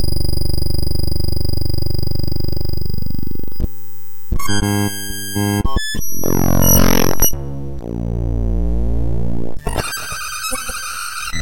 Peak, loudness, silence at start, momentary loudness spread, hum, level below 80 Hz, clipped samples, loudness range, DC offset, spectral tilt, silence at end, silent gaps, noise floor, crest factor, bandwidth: -2 dBFS; -20 LUFS; 0 s; 12 LU; none; -24 dBFS; under 0.1%; 6 LU; under 0.1%; -4 dB/octave; 0 s; none; -36 dBFS; 14 dB; 17.5 kHz